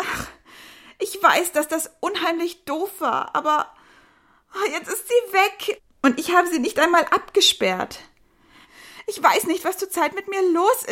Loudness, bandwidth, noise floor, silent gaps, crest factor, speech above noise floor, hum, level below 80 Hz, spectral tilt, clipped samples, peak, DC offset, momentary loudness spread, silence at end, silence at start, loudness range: -21 LUFS; 16.5 kHz; -57 dBFS; none; 20 dB; 36 dB; none; -60 dBFS; -2 dB/octave; under 0.1%; -2 dBFS; under 0.1%; 13 LU; 0 s; 0 s; 5 LU